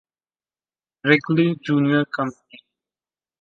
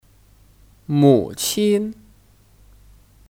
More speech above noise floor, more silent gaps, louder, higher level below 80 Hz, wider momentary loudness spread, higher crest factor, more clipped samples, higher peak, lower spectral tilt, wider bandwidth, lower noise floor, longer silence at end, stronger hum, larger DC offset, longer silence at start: first, over 70 dB vs 35 dB; neither; about the same, -20 LUFS vs -18 LUFS; second, -68 dBFS vs -52 dBFS; second, 9 LU vs 14 LU; about the same, 20 dB vs 18 dB; neither; about the same, -2 dBFS vs -2 dBFS; first, -7.5 dB/octave vs -5.5 dB/octave; second, 7.4 kHz vs 18 kHz; first, under -90 dBFS vs -53 dBFS; second, 1.1 s vs 1.4 s; neither; neither; first, 1.05 s vs 0.9 s